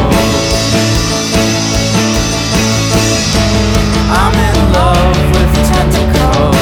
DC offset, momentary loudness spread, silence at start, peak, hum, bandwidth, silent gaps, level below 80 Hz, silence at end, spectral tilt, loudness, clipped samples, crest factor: under 0.1%; 2 LU; 0 s; 0 dBFS; none; 19 kHz; none; -16 dBFS; 0 s; -4.5 dB/octave; -10 LUFS; under 0.1%; 10 dB